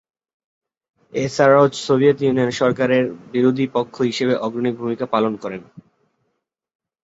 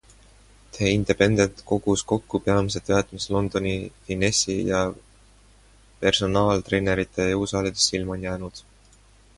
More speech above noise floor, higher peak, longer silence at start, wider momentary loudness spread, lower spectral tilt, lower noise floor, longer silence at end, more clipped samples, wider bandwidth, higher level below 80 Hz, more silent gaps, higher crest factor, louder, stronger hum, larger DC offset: first, 57 dB vs 31 dB; about the same, -2 dBFS vs -2 dBFS; first, 1.15 s vs 0.75 s; about the same, 10 LU vs 9 LU; first, -6 dB/octave vs -4.5 dB/octave; first, -75 dBFS vs -54 dBFS; first, 1.25 s vs 0.75 s; neither; second, 8 kHz vs 11.5 kHz; second, -60 dBFS vs -44 dBFS; neither; about the same, 18 dB vs 22 dB; first, -18 LUFS vs -23 LUFS; neither; neither